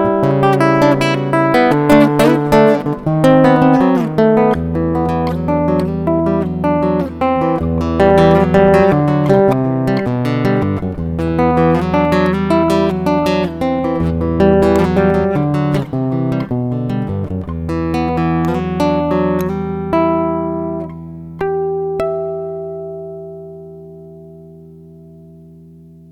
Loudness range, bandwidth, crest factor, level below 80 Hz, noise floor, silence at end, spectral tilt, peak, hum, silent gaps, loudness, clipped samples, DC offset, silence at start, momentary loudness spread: 11 LU; 15.5 kHz; 14 dB; -34 dBFS; -39 dBFS; 0.75 s; -8 dB/octave; 0 dBFS; none; none; -14 LUFS; under 0.1%; under 0.1%; 0 s; 12 LU